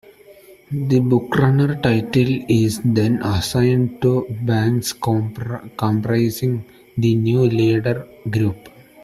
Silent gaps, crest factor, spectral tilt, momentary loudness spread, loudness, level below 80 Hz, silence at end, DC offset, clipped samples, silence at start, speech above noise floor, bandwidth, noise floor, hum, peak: none; 16 dB; -7 dB/octave; 9 LU; -19 LUFS; -48 dBFS; 0.35 s; under 0.1%; under 0.1%; 0.3 s; 28 dB; 14.5 kHz; -45 dBFS; none; -2 dBFS